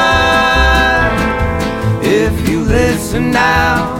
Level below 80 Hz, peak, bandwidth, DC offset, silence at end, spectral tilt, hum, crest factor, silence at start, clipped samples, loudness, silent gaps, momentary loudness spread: -22 dBFS; 0 dBFS; 17 kHz; under 0.1%; 0 s; -5 dB/octave; none; 12 dB; 0 s; under 0.1%; -12 LUFS; none; 6 LU